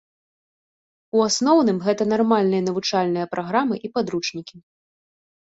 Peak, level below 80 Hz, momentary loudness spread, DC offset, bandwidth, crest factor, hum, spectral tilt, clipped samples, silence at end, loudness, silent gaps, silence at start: -6 dBFS; -66 dBFS; 8 LU; under 0.1%; 8 kHz; 18 dB; none; -4.5 dB/octave; under 0.1%; 1 s; -21 LUFS; none; 1.15 s